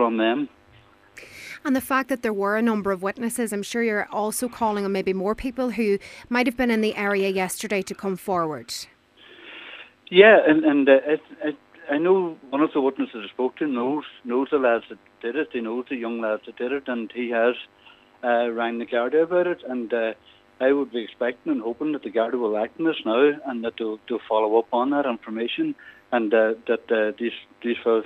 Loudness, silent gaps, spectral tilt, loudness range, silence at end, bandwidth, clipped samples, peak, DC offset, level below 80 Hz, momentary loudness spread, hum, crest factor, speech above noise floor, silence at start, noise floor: -23 LUFS; none; -4.5 dB/octave; 7 LU; 0 s; 15.5 kHz; under 0.1%; 0 dBFS; under 0.1%; -60 dBFS; 10 LU; none; 22 dB; 31 dB; 0 s; -54 dBFS